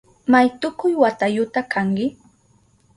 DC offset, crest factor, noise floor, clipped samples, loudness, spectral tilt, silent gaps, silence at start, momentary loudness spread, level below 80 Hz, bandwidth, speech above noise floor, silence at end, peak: under 0.1%; 18 dB; -58 dBFS; under 0.1%; -19 LUFS; -6.5 dB/octave; none; 0.3 s; 7 LU; -60 dBFS; 11 kHz; 39 dB; 0.85 s; -2 dBFS